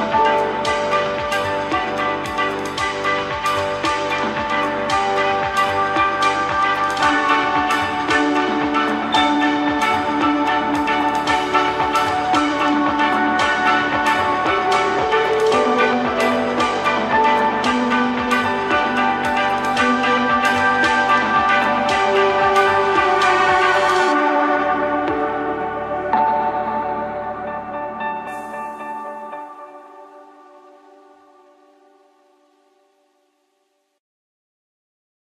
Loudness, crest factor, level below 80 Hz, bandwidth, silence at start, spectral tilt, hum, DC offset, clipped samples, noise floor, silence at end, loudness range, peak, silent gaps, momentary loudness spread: -17 LUFS; 16 dB; -50 dBFS; 15 kHz; 0 s; -4 dB/octave; none; under 0.1%; under 0.1%; -67 dBFS; 5.05 s; 8 LU; -2 dBFS; none; 9 LU